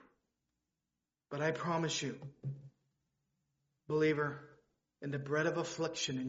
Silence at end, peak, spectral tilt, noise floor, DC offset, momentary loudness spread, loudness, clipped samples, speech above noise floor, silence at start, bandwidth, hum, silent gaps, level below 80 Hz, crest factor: 0 s; -20 dBFS; -4 dB/octave; under -90 dBFS; under 0.1%; 14 LU; -37 LUFS; under 0.1%; over 54 dB; 1.3 s; 7.6 kHz; none; none; -76 dBFS; 20 dB